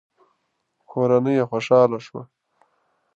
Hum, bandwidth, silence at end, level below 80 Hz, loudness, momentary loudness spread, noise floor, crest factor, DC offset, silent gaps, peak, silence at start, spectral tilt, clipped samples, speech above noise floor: none; 7.6 kHz; 0.9 s; -72 dBFS; -20 LUFS; 18 LU; -72 dBFS; 18 dB; under 0.1%; none; -4 dBFS; 0.95 s; -7.5 dB/octave; under 0.1%; 53 dB